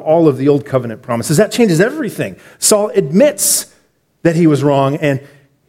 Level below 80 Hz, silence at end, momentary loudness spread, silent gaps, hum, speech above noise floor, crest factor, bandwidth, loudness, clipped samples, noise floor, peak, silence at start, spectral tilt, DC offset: -54 dBFS; 0.5 s; 10 LU; none; none; 44 dB; 14 dB; 17 kHz; -13 LUFS; under 0.1%; -56 dBFS; 0 dBFS; 0 s; -5 dB/octave; under 0.1%